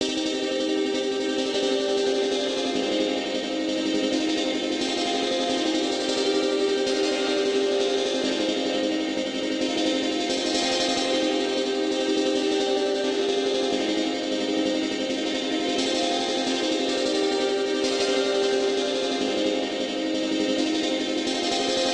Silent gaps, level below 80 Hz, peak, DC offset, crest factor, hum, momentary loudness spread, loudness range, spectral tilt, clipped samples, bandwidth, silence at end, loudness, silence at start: none; -60 dBFS; -10 dBFS; under 0.1%; 14 dB; none; 3 LU; 1 LU; -2.5 dB/octave; under 0.1%; 11 kHz; 0 s; -24 LUFS; 0 s